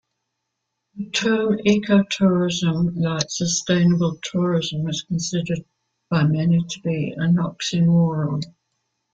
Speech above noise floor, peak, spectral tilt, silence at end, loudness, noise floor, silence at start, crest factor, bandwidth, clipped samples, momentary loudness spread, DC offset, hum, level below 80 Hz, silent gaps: 58 dB; -4 dBFS; -5.5 dB/octave; 0.65 s; -21 LUFS; -78 dBFS; 0.95 s; 16 dB; 7.8 kHz; under 0.1%; 8 LU; under 0.1%; none; -56 dBFS; none